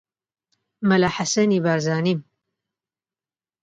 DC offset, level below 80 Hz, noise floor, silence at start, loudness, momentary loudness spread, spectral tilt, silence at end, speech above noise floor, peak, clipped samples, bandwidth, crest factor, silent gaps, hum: under 0.1%; -60 dBFS; under -90 dBFS; 0.8 s; -21 LUFS; 6 LU; -5 dB/octave; 1.4 s; over 70 dB; -6 dBFS; under 0.1%; 9.2 kHz; 18 dB; none; none